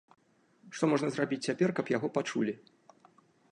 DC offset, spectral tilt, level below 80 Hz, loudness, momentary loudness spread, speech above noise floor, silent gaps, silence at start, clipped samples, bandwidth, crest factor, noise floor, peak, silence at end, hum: under 0.1%; -5.5 dB/octave; -80 dBFS; -32 LUFS; 6 LU; 33 dB; none; 0.65 s; under 0.1%; 11 kHz; 18 dB; -64 dBFS; -14 dBFS; 0.95 s; none